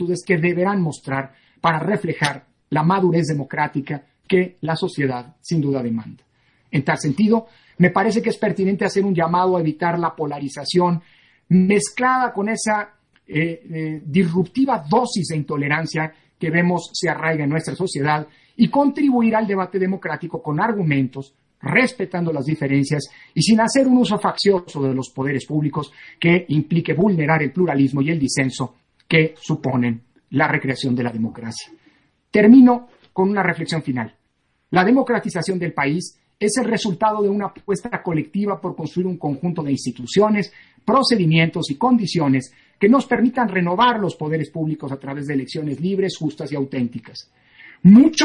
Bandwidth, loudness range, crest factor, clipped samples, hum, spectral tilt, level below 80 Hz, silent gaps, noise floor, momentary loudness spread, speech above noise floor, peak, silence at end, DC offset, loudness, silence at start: 11 kHz; 5 LU; 18 dB; under 0.1%; none; -6 dB/octave; -58 dBFS; none; -67 dBFS; 11 LU; 49 dB; -2 dBFS; 0 s; under 0.1%; -19 LUFS; 0 s